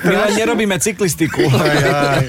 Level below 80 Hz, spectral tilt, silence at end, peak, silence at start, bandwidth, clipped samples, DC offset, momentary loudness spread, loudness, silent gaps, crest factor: -42 dBFS; -4.5 dB/octave; 0 s; -4 dBFS; 0 s; 17 kHz; under 0.1%; under 0.1%; 3 LU; -15 LUFS; none; 12 dB